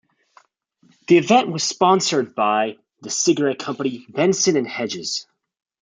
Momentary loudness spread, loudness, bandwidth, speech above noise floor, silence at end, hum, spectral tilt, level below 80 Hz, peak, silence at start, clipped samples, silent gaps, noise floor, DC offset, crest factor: 10 LU; -19 LUFS; 9.6 kHz; 41 dB; 0.6 s; none; -3.5 dB/octave; -68 dBFS; -2 dBFS; 1.1 s; under 0.1%; none; -60 dBFS; under 0.1%; 18 dB